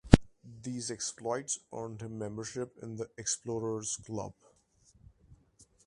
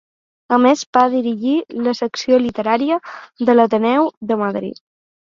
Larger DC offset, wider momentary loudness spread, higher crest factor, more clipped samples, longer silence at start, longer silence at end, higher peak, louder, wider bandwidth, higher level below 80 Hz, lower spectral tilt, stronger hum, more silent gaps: neither; about the same, 8 LU vs 8 LU; first, 34 dB vs 16 dB; neither; second, 0.05 s vs 0.5 s; second, 0.25 s vs 0.6 s; about the same, 0 dBFS vs 0 dBFS; second, -35 LUFS vs -17 LUFS; first, 11.5 kHz vs 7.6 kHz; first, -44 dBFS vs -60 dBFS; about the same, -5 dB/octave vs -5 dB/octave; neither; second, none vs 0.86-0.93 s, 4.17-4.21 s